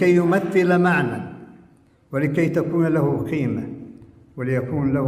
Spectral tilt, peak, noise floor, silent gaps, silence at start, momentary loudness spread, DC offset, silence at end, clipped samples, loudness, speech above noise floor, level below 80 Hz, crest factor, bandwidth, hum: -8 dB/octave; -8 dBFS; -54 dBFS; none; 0 s; 19 LU; under 0.1%; 0 s; under 0.1%; -21 LUFS; 34 dB; -54 dBFS; 14 dB; 13.5 kHz; none